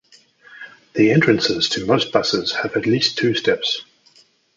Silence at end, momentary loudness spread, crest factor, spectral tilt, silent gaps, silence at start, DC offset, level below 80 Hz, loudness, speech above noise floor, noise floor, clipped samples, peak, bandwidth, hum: 0.75 s; 12 LU; 18 dB; -4.5 dB/octave; none; 0.5 s; under 0.1%; -56 dBFS; -18 LUFS; 36 dB; -54 dBFS; under 0.1%; -2 dBFS; 7.8 kHz; none